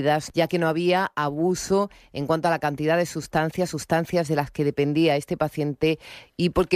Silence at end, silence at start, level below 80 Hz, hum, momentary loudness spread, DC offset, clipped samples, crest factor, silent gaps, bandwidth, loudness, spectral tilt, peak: 0 s; 0 s; -50 dBFS; none; 5 LU; under 0.1%; under 0.1%; 16 dB; none; 15.5 kHz; -24 LUFS; -5.5 dB/octave; -8 dBFS